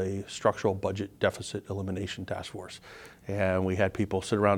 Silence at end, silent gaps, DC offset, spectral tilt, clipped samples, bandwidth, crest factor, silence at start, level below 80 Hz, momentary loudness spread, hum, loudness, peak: 0 s; none; under 0.1%; -6 dB/octave; under 0.1%; 16 kHz; 22 dB; 0 s; -58 dBFS; 15 LU; none; -31 LUFS; -8 dBFS